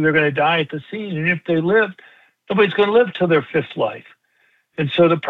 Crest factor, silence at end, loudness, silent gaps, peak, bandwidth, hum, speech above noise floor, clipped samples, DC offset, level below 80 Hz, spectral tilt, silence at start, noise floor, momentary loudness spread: 16 dB; 0 s; -18 LUFS; none; -4 dBFS; 4.7 kHz; none; 44 dB; under 0.1%; under 0.1%; -64 dBFS; -8.5 dB/octave; 0 s; -61 dBFS; 10 LU